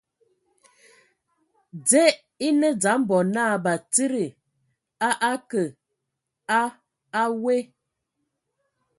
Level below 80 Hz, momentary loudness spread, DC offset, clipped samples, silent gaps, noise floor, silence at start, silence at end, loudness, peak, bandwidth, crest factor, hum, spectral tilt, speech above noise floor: -74 dBFS; 11 LU; under 0.1%; under 0.1%; none; -82 dBFS; 1.75 s; 1.35 s; -23 LUFS; -4 dBFS; 12 kHz; 22 dB; none; -3.5 dB/octave; 60 dB